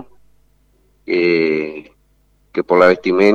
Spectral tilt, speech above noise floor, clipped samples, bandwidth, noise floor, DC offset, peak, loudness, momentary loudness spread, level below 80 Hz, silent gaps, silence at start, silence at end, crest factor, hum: -6.5 dB/octave; 44 dB; under 0.1%; 7.4 kHz; -57 dBFS; under 0.1%; 0 dBFS; -15 LUFS; 14 LU; -56 dBFS; none; 0 s; 0 s; 18 dB; 50 Hz at -55 dBFS